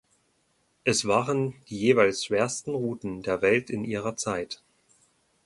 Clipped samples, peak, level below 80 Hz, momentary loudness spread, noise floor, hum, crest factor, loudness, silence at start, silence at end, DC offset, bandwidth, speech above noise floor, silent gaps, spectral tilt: under 0.1%; -6 dBFS; -62 dBFS; 10 LU; -70 dBFS; none; 22 dB; -26 LUFS; 0.85 s; 0.9 s; under 0.1%; 11.5 kHz; 44 dB; none; -4 dB/octave